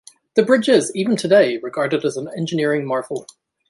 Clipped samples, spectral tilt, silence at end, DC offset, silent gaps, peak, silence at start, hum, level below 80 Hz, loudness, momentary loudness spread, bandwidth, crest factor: under 0.1%; -5 dB/octave; 0.45 s; under 0.1%; none; -2 dBFS; 0.35 s; none; -66 dBFS; -18 LUFS; 10 LU; 11.5 kHz; 16 dB